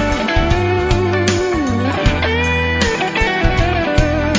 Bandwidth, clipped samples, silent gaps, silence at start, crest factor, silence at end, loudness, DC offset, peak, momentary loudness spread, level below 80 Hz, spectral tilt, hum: 8 kHz; under 0.1%; none; 0 s; 14 dB; 0 s; -16 LUFS; under 0.1%; -2 dBFS; 1 LU; -22 dBFS; -5.5 dB/octave; none